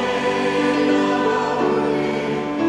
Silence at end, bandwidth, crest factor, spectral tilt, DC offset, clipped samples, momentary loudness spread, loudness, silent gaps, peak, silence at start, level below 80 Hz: 0 s; 11 kHz; 12 dB; -5.5 dB/octave; under 0.1%; under 0.1%; 4 LU; -19 LUFS; none; -8 dBFS; 0 s; -52 dBFS